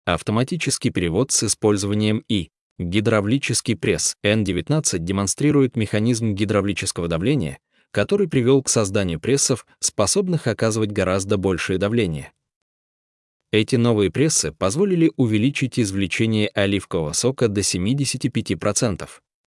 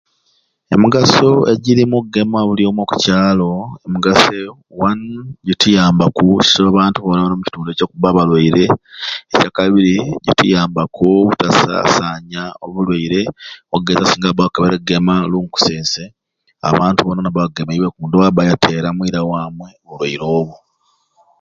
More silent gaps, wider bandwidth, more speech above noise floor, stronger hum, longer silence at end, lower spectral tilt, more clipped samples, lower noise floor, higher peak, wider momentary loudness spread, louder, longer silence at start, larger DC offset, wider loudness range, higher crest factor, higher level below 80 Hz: first, 2.61-2.76 s, 12.56-13.40 s vs none; first, 12 kHz vs 7.8 kHz; first, over 70 dB vs 48 dB; neither; second, 0.35 s vs 0.85 s; about the same, -4.5 dB/octave vs -5.5 dB/octave; neither; first, under -90 dBFS vs -61 dBFS; second, -4 dBFS vs 0 dBFS; second, 5 LU vs 12 LU; second, -20 LUFS vs -14 LUFS; second, 0.05 s vs 0.7 s; neither; about the same, 2 LU vs 4 LU; about the same, 16 dB vs 14 dB; second, -52 dBFS vs -44 dBFS